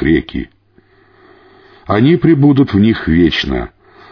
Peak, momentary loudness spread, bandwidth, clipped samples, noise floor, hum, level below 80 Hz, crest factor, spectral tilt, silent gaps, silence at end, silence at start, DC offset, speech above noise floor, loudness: 0 dBFS; 16 LU; 5.4 kHz; under 0.1%; -50 dBFS; none; -32 dBFS; 12 dB; -8 dB/octave; none; 0.45 s; 0 s; under 0.1%; 39 dB; -12 LUFS